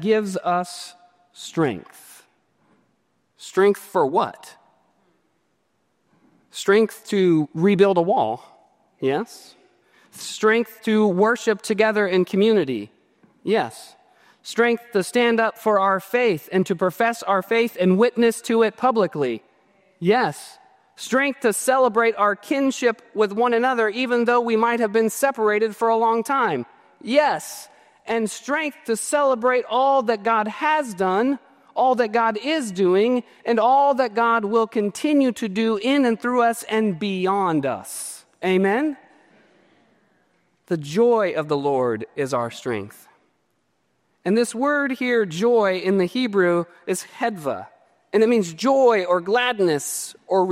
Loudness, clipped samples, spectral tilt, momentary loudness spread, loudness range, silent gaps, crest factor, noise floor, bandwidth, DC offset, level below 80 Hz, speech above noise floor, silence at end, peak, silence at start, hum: -21 LUFS; under 0.1%; -5 dB/octave; 10 LU; 5 LU; none; 18 dB; -69 dBFS; 16 kHz; under 0.1%; -72 dBFS; 49 dB; 0 s; -4 dBFS; 0 s; none